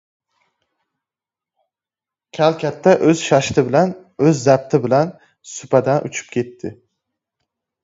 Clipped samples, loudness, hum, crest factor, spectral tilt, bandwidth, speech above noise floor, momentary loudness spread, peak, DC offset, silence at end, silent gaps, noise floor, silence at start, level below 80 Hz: under 0.1%; -17 LUFS; none; 18 dB; -6 dB/octave; 7.8 kHz; 73 dB; 16 LU; 0 dBFS; under 0.1%; 1.1 s; none; -89 dBFS; 2.35 s; -56 dBFS